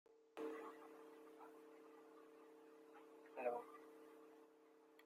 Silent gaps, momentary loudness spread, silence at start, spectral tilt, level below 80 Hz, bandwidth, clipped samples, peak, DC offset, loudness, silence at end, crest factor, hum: none; 17 LU; 0.05 s; -4.5 dB/octave; under -90 dBFS; 15.5 kHz; under 0.1%; -32 dBFS; under 0.1%; -56 LUFS; 0 s; 24 dB; none